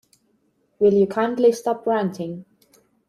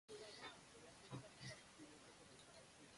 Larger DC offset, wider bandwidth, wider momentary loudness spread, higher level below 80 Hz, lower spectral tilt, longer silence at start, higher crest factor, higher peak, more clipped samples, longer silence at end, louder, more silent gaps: neither; first, 13.5 kHz vs 11.5 kHz; first, 15 LU vs 7 LU; first, -66 dBFS vs -82 dBFS; first, -6.5 dB/octave vs -3.5 dB/octave; first, 0.8 s vs 0.1 s; about the same, 16 dB vs 20 dB; first, -6 dBFS vs -40 dBFS; neither; first, 0.65 s vs 0 s; first, -20 LUFS vs -59 LUFS; neither